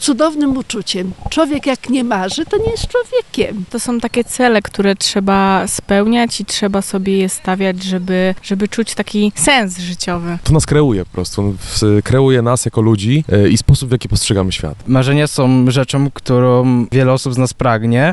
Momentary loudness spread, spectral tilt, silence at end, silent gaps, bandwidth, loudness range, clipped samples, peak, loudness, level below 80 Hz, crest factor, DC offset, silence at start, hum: 7 LU; -5.5 dB/octave; 0 s; none; 12 kHz; 3 LU; under 0.1%; 0 dBFS; -14 LUFS; -32 dBFS; 12 dB; 0.3%; 0 s; none